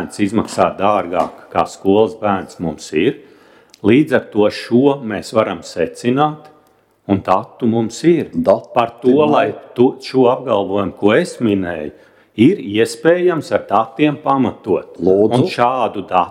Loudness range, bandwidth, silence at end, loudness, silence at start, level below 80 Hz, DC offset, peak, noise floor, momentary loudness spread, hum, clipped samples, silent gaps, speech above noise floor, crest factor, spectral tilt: 3 LU; 14 kHz; 0 s; -16 LUFS; 0 s; -54 dBFS; under 0.1%; 0 dBFS; -54 dBFS; 7 LU; none; under 0.1%; none; 39 dB; 16 dB; -6.5 dB/octave